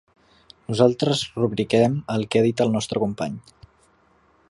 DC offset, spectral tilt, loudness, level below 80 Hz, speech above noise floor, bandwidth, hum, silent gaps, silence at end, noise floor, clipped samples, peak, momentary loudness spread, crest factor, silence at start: under 0.1%; -6 dB/octave; -22 LUFS; -56 dBFS; 38 dB; 11.5 kHz; none; none; 1.1 s; -60 dBFS; under 0.1%; -2 dBFS; 11 LU; 20 dB; 0.7 s